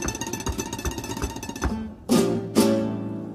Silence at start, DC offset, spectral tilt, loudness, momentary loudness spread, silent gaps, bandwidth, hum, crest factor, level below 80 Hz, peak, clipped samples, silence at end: 0 s; under 0.1%; -5 dB/octave; -26 LUFS; 10 LU; none; 15.5 kHz; none; 20 dB; -38 dBFS; -6 dBFS; under 0.1%; 0 s